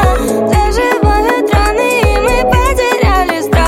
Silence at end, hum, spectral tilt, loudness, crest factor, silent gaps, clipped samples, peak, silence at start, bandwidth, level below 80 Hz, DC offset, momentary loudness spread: 0 s; none; -5.5 dB/octave; -11 LUFS; 10 dB; none; under 0.1%; 0 dBFS; 0 s; 16.5 kHz; -16 dBFS; under 0.1%; 1 LU